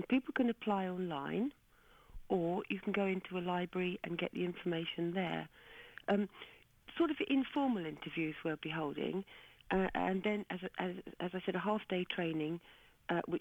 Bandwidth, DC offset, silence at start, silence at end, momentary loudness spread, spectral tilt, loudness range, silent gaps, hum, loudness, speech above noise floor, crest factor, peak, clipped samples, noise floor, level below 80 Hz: 18 kHz; under 0.1%; 0 s; 0 s; 9 LU; -7.5 dB/octave; 2 LU; none; none; -38 LUFS; 28 dB; 16 dB; -22 dBFS; under 0.1%; -65 dBFS; -64 dBFS